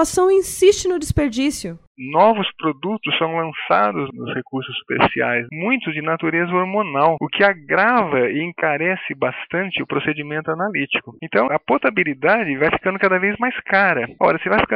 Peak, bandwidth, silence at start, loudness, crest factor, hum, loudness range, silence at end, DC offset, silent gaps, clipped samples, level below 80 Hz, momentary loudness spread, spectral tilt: -2 dBFS; 16 kHz; 0 s; -19 LUFS; 16 dB; none; 3 LU; 0 s; under 0.1%; 1.87-1.95 s; under 0.1%; -46 dBFS; 8 LU; -4.5 dB/octave